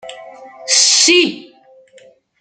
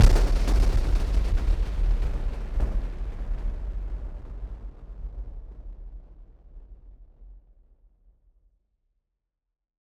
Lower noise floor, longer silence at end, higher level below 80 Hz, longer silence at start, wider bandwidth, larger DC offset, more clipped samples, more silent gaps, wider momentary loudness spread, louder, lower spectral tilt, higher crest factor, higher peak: second, -47 dBFS vs -83 dBFS; second, 1 s vs 2.5 s; second, -70 dBFS vs -26 dBFS; about the same, 0.05 s vs 0 s; about the same, 10.5 kHz vs 10.5 kHz; neither; neither; neither; about the same, 22 LU vs 20 LU; first, -10 LUFS vs -30 LUFS; second, 0.5 dB/octave vs -6 dB/octave; second, 16 dB vs 22 dB; first, 0 dBFS vs -4 dBFS